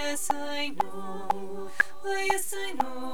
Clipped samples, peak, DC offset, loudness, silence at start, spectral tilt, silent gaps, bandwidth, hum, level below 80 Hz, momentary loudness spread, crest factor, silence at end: under 0.1%; -10 dBFS; 3%; -30 LUFS; 0 s; -2 dB/octave; none; over 20 kHz; none; -62 dBFS; 6 LU; 20 dB; 0 s